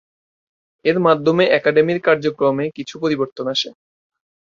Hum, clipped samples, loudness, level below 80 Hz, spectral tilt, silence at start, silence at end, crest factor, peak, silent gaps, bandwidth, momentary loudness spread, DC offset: none; under 0.1%; -18 LUFS; -62 dBFS; -5.5 dB/octave; 0.85 s; 0.75 s; 18 dB; -2 dBFS; 3.32-3.36 s; 7.4 kHz; 9 LU; under 0.1%